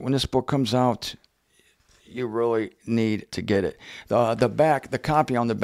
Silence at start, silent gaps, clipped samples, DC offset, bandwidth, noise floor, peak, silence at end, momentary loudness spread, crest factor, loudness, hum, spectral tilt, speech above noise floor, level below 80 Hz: 0 s; none; under 0.1%; under 0.1%; 15.5 kHz; -63 dBFS; -6 dBFS; 0 s; 10 LU; 18 dB; -24 LUFS; none; -6 dB/octave; 40 dB; -52 dBFS